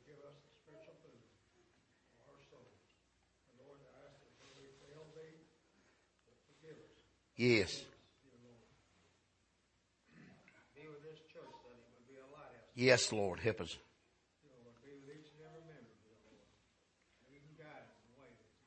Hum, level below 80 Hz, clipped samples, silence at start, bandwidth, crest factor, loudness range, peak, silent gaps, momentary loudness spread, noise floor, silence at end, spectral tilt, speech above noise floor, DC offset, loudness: none; -76 dBFS; under 0.1%; 0.25 s; 8.4 kHz; 30 dB; 24 LU; -16 dBFS; none; 30 LU; -78 dBFS; 0.85 s; -4 dB/octave; 44 dB; under 0.1%; -35 LUFS